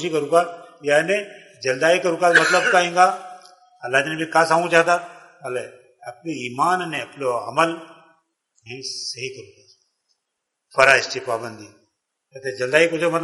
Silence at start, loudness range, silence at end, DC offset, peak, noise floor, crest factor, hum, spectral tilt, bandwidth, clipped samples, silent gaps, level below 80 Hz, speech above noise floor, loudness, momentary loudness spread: 0 s; 9 LU; 0 s; under 0.1%; 0 dBFS; -79 dBFS; 22 dB; none; -3.5 dB/octave; 11.5 kHz; under 0.1%; none; -68 dBFS; 59 dB; -19 LUFS; 20 LU